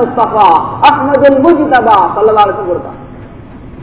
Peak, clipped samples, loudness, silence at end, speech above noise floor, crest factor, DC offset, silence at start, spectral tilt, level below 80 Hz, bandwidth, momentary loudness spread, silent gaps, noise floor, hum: 0 dBFS; 4%; -8 LUFS; 0 s; 22 dB; 10 dB; 0.7%; 0 s; -9.5 dB/octave; -38 dBFS; 4 kHz; 11 LU; none; -30 dBFS; none